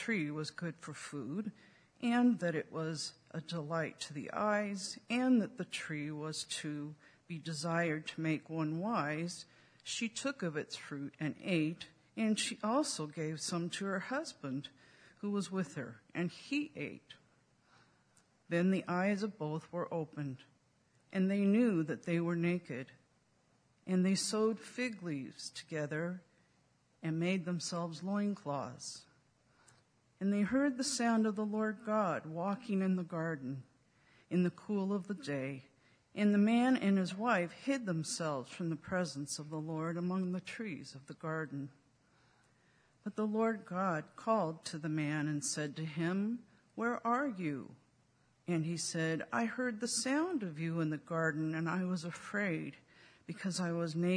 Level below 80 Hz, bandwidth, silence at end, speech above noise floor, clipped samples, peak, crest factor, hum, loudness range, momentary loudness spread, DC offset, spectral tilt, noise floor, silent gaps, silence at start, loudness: -80 dBFS; 11 kHz; 0 s; 37 dB; under 0.1%; -18 dBFS; 20 dB; none; 6 LU; 13 LU; under 0.1%; -5 dB/octave; -73 dBFS; none; 0 s; -37 LUFS